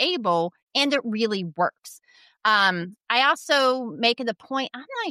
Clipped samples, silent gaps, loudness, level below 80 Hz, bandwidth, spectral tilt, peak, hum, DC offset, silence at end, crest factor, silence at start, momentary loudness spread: under 0.1%; 0.63-0.67 s; -23 LUFS; -80 dBFS; 15 kHz; -3.5 dB/octave; -6 dBFS; none; under 0.1%; 0 s; 18 dB; 0 s; 9 LU